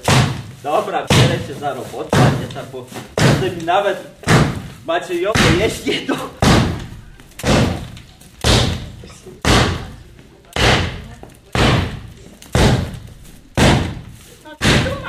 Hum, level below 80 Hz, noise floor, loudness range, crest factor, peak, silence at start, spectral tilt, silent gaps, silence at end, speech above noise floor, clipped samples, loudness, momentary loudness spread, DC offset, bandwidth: none; -30 dBFS; -42 dBFS; 2 LU; 16 dB; 0 dBFS; 0.05 s; -5 dB/octave; none; 0 s; 26 dB; under 0.1%; -17 LUFS; 16 LU; under 0.1%; 15.5 kHz